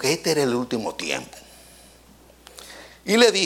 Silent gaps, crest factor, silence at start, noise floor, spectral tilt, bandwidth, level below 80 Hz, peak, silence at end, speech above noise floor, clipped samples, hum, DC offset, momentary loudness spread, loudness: none; 22 dB; 0 s; -51 dBFS; -3 dB/octave; 17 kHz; -58 dBFS; -2 dBFS; 0 s; 30 dB; under 0.1%; none; under 0.1%; 25 LU; -22 LUFS